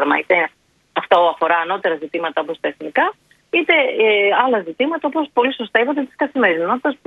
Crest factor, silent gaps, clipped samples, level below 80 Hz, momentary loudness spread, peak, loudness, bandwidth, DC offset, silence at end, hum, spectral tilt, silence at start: 18 dB; none; under 0.1%; -68 dBFS; 8 LU; 0 dBFS; -17 LUFS; 6.4 kHz; under 0.1%; 0.1 s; none; -5.5 dB/octave; 0 s